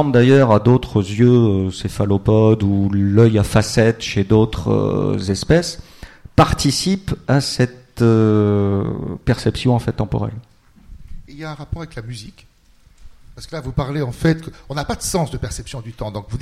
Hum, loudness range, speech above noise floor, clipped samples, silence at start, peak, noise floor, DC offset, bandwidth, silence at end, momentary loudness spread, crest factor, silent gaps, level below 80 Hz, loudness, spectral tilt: none; 13 LU; 34 dB; under 0.1%; 0 s; -2 dBFS; -51 dBFS; under 0.1%; 14 kHz; 0 s; 16 LU; 16 dB; none; -36 dBFS; -17 LUFS; -6.5 dB/octave